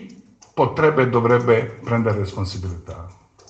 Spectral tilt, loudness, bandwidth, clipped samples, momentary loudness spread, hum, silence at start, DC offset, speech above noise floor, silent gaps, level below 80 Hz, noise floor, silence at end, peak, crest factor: -7.5 dB/octave; -19 LUFS; 8.2 kHz; under 0.1%; 16 LU; none; 0 s; under 0.1%; 27 dB; none; -48 dBFS; -46 dBFS; 0.35 s; -2 dBFS; 18 dB